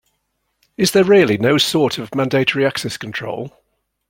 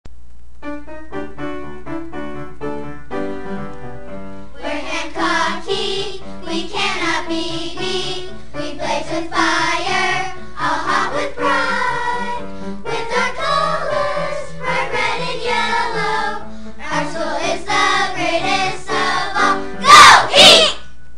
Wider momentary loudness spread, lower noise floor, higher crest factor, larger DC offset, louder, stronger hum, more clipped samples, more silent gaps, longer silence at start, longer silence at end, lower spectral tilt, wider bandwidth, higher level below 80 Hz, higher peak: second, 13 LU vs 16 LU; first, -70 dBFS vs -43 dBFS; about the same, 16 dB vs 18 dB; second, under 0.1% vs 6%; about the same, -16 LUFS vs -15 LUFS; neither; second, under 0.1% vs 0.4%; neither; first, 0.8 s vs 0.05 s; first, 0.6 s vs 0.25 s; first, -4.5 dB/octave vs -2 dB/octave; first, 16.5 kHz vs 12 kHz; second, -56 dBFS vs -44 dBFS; about the same, -2 dBFS vs 0 dBFS